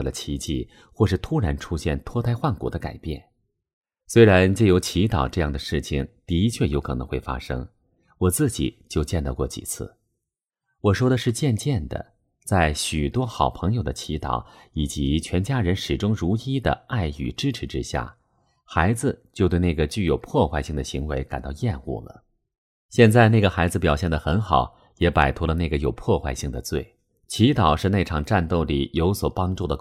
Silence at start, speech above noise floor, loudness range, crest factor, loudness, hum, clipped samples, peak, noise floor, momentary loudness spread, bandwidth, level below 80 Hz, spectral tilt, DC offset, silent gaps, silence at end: 0 s; 62 dB; 6 LU; 22 dB; -23 LUFS; none; under 0.1%; -2 dBFS; -84 dBFS; 12 LU; 15.5 kHz; -36 dBFS; -6 dB/octave; under 0.1%; 3.73-3.81 s, 22.58-22.89 s; 0 s